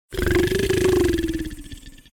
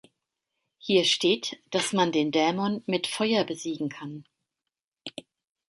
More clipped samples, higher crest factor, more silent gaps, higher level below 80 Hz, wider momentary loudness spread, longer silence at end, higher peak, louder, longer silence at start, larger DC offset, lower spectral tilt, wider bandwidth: neither; second, 10 dB vs 18 dB; second, none vs 4.84-4.92 s; first, -32 dBFS vs -74 dBFS; about the same, 17 LU vs 19 LU; second, 0.2 s vs 0.6 s; about the same, -12 dBFS vs -10 dBFS; first, -21 LUFS vs -26 LUFS; second, 0.1 s vs 0.85 s; neither; first, -5.5 dB/octave vs -4 dB/octave; first, 18 kHz vs 11.5 kHz